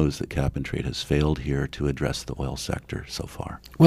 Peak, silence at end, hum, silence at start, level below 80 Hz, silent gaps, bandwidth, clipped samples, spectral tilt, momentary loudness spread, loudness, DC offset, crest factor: 0 dBFS; 0 s; none; 0 s; -36 dBFS; none; 15 kHz; under 0.1%; -6 dB/octave; 10 LU; -28 LUFS; under 0.1%; 24 dB